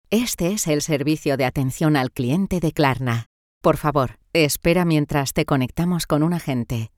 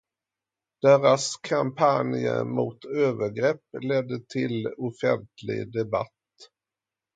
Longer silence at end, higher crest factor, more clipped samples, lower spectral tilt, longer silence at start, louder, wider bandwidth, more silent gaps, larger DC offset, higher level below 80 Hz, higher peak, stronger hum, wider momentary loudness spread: second, 0.1 s vs 0.7 s; about the same, 18 dB vs 20 dB; neither; about the same, -5.5 dB/octave vs -5.5 dB/octave; second, 0.1 s vs 0.85 s; first, -21 LUFS vs -25 LUFS; first, 18 kHz vs 9.4 kHz; first, 3.26-3.61 s vs none; neither; first, -42 dBFS vs -68 dBFS; about the same, -4 dBFS vs -6 dBFS; neither; second, 4 LU vs 11 LU